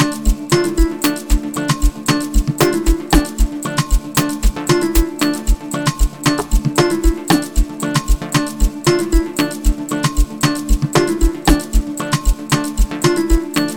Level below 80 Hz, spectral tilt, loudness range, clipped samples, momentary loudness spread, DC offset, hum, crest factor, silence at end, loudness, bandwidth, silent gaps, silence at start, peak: -18 dBFS; -4.5 dB/octave; 1 LU; under 0.1%; 5 LU; 0.6%; none; 16 dB; 0 s; -17 LUFS; over 20 kHz; none; 0 s; 0 dBFS